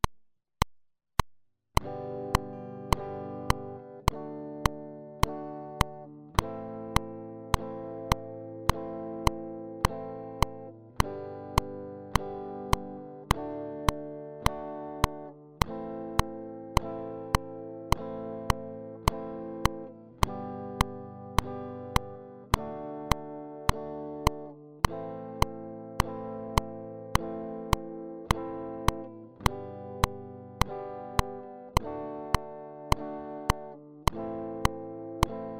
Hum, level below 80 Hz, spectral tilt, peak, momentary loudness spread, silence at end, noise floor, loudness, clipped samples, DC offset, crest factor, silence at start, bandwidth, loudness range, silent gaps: none; -38 dBFS; -5 dB/octave; -8 dBFS; 10 LU; 0 s; -60 dBFS; -33 LUFS; under 0.1%; under 0.1%; 24 dB; 0.05 s; 16 kHz; 1 LU; none